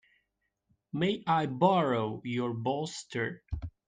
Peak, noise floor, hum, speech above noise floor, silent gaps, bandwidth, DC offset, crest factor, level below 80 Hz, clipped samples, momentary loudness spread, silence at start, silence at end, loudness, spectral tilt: -12 dBFS; -81 dBFS; none; 51 dB; none; 9.8 kHz; under 0.1%; 20 dB; -52 dBFS; under 0.1%; 11 LU; 0.95 s; 0.2 s; -31 LUFS; -6 dB/octave